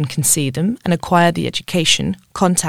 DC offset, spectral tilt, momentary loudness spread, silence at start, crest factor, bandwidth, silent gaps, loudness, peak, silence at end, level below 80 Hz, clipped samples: under 0.1%; -3.5 dB/octave; 6 LU; 0 s; 16 dB; 16.5 kHz; none; -16 LUFS; 0 dBFS; 0 s; -46 dBFS; under 0.1%